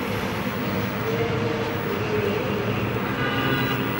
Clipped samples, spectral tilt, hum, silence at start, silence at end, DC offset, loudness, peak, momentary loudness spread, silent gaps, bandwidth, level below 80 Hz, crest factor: under 0.1%; -6 dB/octave; none; 0 s; 0 s; under 0.1%; -25 LUFS; -12 dBFS; 3 LU; none; 16.5 kHz; -46 dBFS; 14 dB